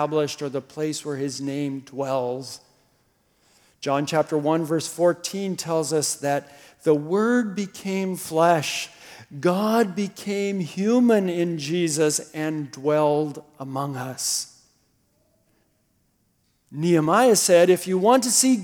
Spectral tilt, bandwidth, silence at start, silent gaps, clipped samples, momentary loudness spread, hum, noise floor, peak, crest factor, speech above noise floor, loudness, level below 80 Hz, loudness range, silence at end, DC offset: -4.5 dB/octave; 19 kHz; 0 s; none; under 0.1%; 13 LU; none; -67 dBFS; -4 dBFS; 20 dB; 45 dB; -23 LUFS; -74 dBFS; 8 LU; 0 s; under 0.1%